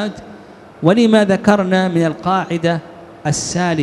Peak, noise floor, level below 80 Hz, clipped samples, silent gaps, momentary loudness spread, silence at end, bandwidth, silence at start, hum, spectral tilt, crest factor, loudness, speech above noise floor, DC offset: 0 dBFS; -38 dBFS; -50 dBFS; under 0.1%; none; 12 LU; 0 s; 12 kHz; 0 s; none; -5.5 dB/octave; 16 dB; -16 LUFS; 23 dB; under 0.1%